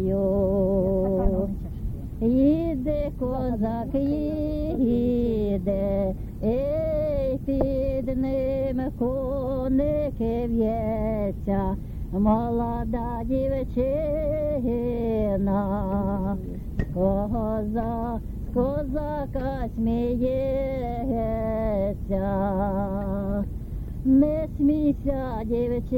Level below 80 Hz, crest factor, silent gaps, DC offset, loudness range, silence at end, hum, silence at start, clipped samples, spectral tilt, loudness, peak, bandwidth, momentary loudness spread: -34 dBFS; 16 dB; none; under 0.1%; 2 LU; 0 s; none; 0 s; under 0.1%; -10.5 dB/octave; -26 LUFS; -8 dBFS; 17 kHz; 7 LU